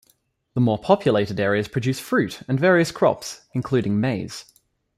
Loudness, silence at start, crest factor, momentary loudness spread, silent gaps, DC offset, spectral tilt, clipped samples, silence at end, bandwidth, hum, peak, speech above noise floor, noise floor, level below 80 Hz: -22 LUFS; 0.55 s; 20 dB; 12 LU; none; under 0.1%; -6 dB/octave; under 0.1%; 0.55 s; 15.5 kHz; none; -2 dBFS; 44 dB; -64 dBFS; -58 dBFS